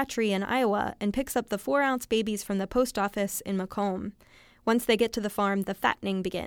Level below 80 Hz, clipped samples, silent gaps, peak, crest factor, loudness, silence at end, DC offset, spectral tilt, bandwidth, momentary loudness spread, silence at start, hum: -54 dBFS; under 0.1%; none; -8 dBFS; 20 dB; -28 LUFS; 0 s; under 0.1%; -4.5 dB/octave; 19.5 kHz; 5 LU; 0 s; none